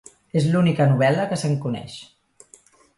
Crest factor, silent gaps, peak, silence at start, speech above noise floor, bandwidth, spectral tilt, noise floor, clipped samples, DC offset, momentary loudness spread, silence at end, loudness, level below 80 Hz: 16 dB; none; -6 dBFS; 0.35 s; 33 dB; 11.5 kHz; -7 dB/octave; -53 dBFS; under 0.1%; under 0.1%; 14 LU; 0.95 s; -21 LUFS; -58 dBFS